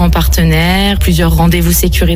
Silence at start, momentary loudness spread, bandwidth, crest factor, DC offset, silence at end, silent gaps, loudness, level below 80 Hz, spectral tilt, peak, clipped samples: 0 s; 1 LU; 17.5 kHz; 8 dB; under 0.1%; 0 s; none; -10 LUFS; -14 dBFS; -5 dB/octave; 0 dBFS; under 0.1%